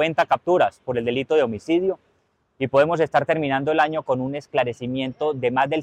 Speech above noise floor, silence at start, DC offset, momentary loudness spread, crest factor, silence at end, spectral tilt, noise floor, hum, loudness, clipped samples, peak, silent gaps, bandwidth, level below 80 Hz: 45 dB; 0 s; under 0.1%; 7 LU; 14 dB; 0 s; -6.5 dB/octave; -66 dBFS; none; -22 LUFS; under 0.1%; -8 dBFS; none; 9.4 kHz; -60 dBFS